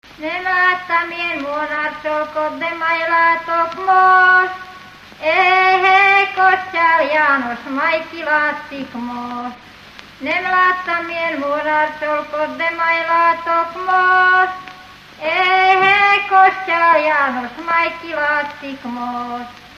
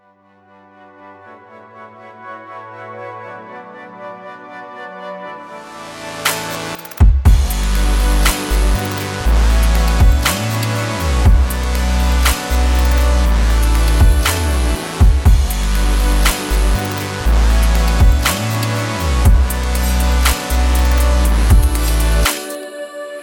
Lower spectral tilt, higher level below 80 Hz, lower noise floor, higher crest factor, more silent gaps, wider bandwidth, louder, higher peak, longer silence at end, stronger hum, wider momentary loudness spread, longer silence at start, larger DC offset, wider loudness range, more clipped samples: about the same, -3.5 dB/octave vs -4.5 dB/octave; second, -56 dBFS vs -16 dBFS; second, -39 dBFS vs -50 dBFS; about the same, 16 dB vs 12 dB; neither; second, 13.5 kHz vs 18.5 kHz; about the same, -15 LUFS vs -15 LUFS; about the same, 0 dBFS vs -2 dBFS; about the same, 0 s vs 0 s; first, 50 Hz at -65 dBFS vs none; second, 15 LU vs 18 LU; second, 0.2 s vs 1.05 s; neither; second, 6 LU vs 17 LU; neither